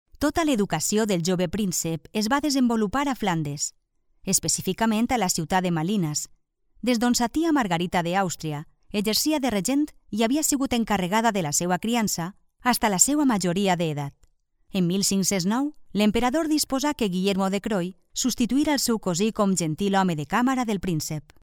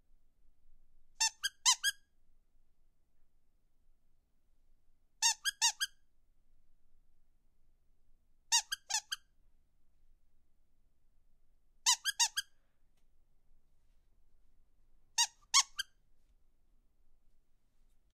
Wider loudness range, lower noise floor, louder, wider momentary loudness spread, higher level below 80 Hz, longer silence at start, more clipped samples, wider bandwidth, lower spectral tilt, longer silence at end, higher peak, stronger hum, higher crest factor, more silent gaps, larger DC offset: about the same, 2 LU vs 4 LU; second, -62 dBFS vs -67 dBFS; first, -24 LUFS vs -32 LUFS; second, 7 LU vs 11 LU; first, -50 dBFS vs -68 dBFS; second, 0.2 s vs 0.7 s; neither; first, 19 kHz vs 15.5 kHz; first, -4 dB/octave vs 5.5 dB/octave; second, 0.25 s vs 2.35 s; first, -4 dBFS vs -12 dBFS; neither; second, 22 dB vs 28 dB; neither; neither